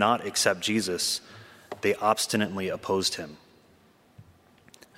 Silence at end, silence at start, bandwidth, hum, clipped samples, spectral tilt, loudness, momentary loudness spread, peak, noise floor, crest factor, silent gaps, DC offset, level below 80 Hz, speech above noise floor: 0.75 s; 0 s; 16 kHz; none; under 0.1%; -2.5 dB/octave; -27 LUFS; 12 LU; -6 dBFS; -60 dBFS; 24 dB; none; under 0.1%; -70 dBFS; 33 dB